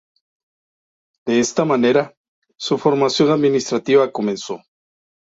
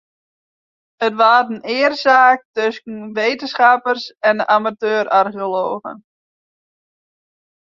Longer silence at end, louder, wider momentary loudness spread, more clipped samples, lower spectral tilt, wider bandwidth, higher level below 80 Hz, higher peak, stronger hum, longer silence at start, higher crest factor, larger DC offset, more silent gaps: second, 0.85 s vs 1.8 s; about the same, -17 LUFS vs -16 LUFS; first, 15 LU vs 10 LU; neither; about the same, -5 dB/octave vs -4 dB/octave; about the same, 7.8 kHz vs 7.2 kHz; first, -62 dBFS vs -70 dBFS; about the same, -2 dBFS vs -2 dBFS; neither; first, 1.25 s vs 1 s; about the same, 18 dB vs 16 dB; neither; first, 2.17-2.42 s vs 2.45-2.54 s